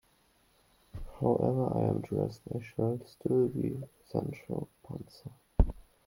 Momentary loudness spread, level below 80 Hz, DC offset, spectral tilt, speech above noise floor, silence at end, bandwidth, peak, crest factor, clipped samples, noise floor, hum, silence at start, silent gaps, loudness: 16 LU; -42 dBFS; under 0.1%; -9.5 dB/octave; 36 dB; 0.25 s; 16.5 kHz; -10 dBFS; 24 dB; under 0.1%; -68 dBFS; none; 0.95 s; none; -33 LUFS